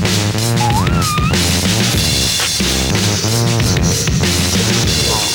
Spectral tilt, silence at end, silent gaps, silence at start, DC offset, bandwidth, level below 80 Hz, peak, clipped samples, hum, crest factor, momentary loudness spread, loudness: -3.5 dB/octave; 0 s; none; 0 s; under 0.1%; 19.5 kHz; -26 dBFS; -2 dBFS; under 0.1%; none; 12 dB; 2 LU; -13 LUFS